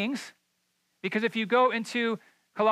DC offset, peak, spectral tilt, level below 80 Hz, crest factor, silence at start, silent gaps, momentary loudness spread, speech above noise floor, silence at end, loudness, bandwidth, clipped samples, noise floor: under 0.1%; -12 dBFS; -4.5 dB/octave; -88 dBFS; 16 dB; 0 s; none; 14 LU; 47 dB; 0 s; -28 LUFS; 13.5 kHz; under 0.1%; -75 dBFS